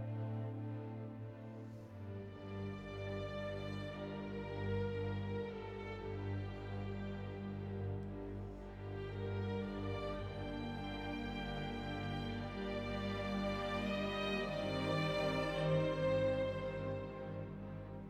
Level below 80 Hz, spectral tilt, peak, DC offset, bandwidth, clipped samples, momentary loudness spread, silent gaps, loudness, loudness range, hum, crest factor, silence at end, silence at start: -56 dBFS; -7 dB/octave; -24 dBFS; under 0.1%; 10 kHz; under 0.1%; 11 LU; none; -42 LUFS; 8 LU; 50 Hz at -55 dBFS; 16 dB; 0 s; 0 s